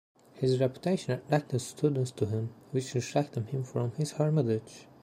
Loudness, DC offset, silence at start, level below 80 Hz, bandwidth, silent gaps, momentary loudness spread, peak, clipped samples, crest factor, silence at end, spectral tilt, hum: -31 LUFS; under 0.1%; 0.35 s; -70 dBFS; 13.5 kHz; none; 7 LU; -12 dBFS; under 0.1%; 18 dB; 0.2 s; -6.5 dB/octave; none